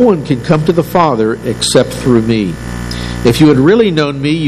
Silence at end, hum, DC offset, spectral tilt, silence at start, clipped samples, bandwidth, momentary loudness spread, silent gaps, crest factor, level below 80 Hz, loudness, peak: 0 s; none; under 0.1%; -6 dB/octave; 0 s; 0.8%; 14.5 kHz; 11 LU; none; 10 dB; -32 dBFS; -11 LUFS; 0 dBFS